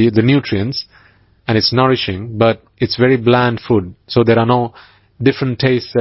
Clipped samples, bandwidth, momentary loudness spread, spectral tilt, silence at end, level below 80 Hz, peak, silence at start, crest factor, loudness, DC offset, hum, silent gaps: under 0.1%; 5.8 kHz; 9 LU; -9.5 dB/octave; 0 s; -42 dBFS; 0 dBFS; 0 s; 14 dB; -15 LUFS; under 0.1%; none; none